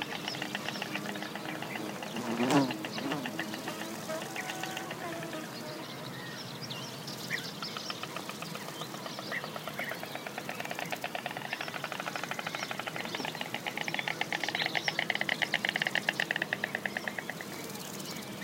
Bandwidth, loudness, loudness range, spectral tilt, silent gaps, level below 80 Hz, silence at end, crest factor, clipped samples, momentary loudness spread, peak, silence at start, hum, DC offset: 17 kHz; -35 LUFS; 7 LU; -3 dB/octave; none; -78 dBFS; 0 s; 26 dB; under 0.1%; 10 LU; -10 dBFS; 0 s; none; under 0.1%